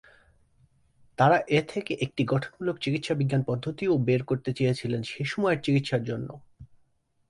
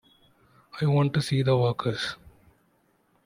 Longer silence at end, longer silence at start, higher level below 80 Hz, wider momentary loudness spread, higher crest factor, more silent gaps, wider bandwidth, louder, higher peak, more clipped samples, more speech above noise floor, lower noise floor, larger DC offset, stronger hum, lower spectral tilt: second, 0.65 s vs 0.95 s; first, 1.2 s vs 0.75 s; about the same, -60 dBFS vs -60 dBFS; second, 9 LU vs 14 LU; about the same, 20 dB vs 18 dB; neither; about the same, 11.5 kHz vs 11.5 kHz; about the same, -27 LUFS vs -26 LUFS; about the same, -8 dBFS vs -10 dBFS; neither; about the same, 42 dB vs 43 dB; about the same, -68 dBFS vs -67 dBFS; neither; neither; about the same, -7 dB/octave vs -6.5 dB/octave